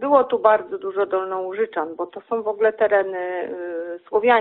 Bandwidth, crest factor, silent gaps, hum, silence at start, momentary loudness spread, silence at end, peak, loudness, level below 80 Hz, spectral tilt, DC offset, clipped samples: 4.2 kHz; 18 dB; none; none; 0 s; 11 LU; 0 s; -2 dBFS; -22 LUFS; -70 dBFS; -2 dB/octave; under 0.1%; under 0.1%